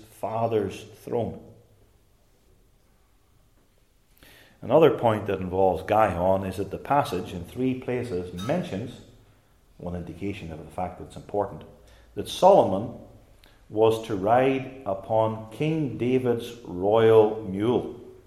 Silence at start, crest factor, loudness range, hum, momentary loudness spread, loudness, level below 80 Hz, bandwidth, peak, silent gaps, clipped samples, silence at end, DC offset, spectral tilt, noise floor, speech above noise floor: 0.25 s; 22 dB; 11 LU; none; 17 LU; -25 LUFS; -56 dBFS; 14.5 kHz; -4 dBFS; none; under 0.1%; 0.15 s; under 0.1%; -7 dB/octave; -62 dBFS; 38 dB